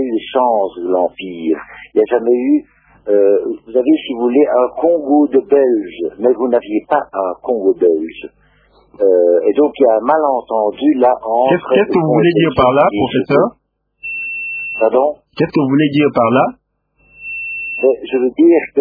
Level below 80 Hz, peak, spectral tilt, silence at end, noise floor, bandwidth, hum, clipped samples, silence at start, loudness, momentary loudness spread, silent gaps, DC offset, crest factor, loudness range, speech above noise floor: -50 dBFS; 0 dBFS; -10 dB/octave; 0 s; -56 dBFS; 5 kHz; none; under 0.1%; 0 s; -14 LUFS; 9 LU; none; under 0.1%; 14 dB; 3 LU; 43 dB